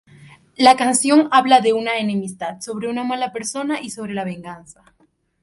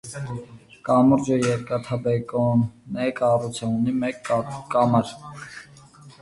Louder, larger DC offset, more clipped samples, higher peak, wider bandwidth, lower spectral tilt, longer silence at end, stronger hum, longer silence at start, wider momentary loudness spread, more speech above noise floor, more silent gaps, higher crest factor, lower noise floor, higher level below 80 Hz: first, -18 LUFS vs -23 LUFS; neither; neither; first, 0 dBFS vs -6 dBFS; about the same, 11.5 kHz vs 11.5 kHz; second, -3.5 dB/octave vs -7 dB/octave; first, 0.85 s vs 0.1 s; neither; first, 0.2 s vs 0.05 s; about the same, 15 LU vs 17 LU; about the same, 28 dB vs 25 dB; neither; about the same, 20 dB vs 18 dB; about the same, -46 dBFS vs -47 dBFS; second, -64 dBFS vs -56 dBFS